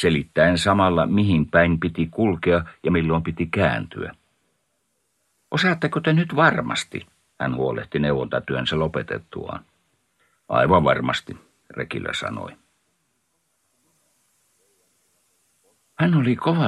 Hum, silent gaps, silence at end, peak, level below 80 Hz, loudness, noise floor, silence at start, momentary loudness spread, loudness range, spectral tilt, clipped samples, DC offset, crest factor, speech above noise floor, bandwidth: none; none; 0 s; -2 dBFS; -46 dBFS; -21 LUFS; -71 dBFS; 0 s; 16 LU; 12 LU; -6.5 dB/octave; under 0.1%; under 0.1%; 20 dB; 51 dB; 11.5 kHz